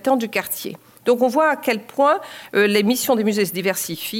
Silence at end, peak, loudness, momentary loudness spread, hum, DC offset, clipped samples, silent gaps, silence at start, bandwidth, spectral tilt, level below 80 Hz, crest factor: 0 s; -4 dBFS; -19 LUFS; 8 LU; none; under 0.1%; under 0.1%; none; 0.05 s; 17 kHz; -4 dB/octave; -70 dBFS; 16 dB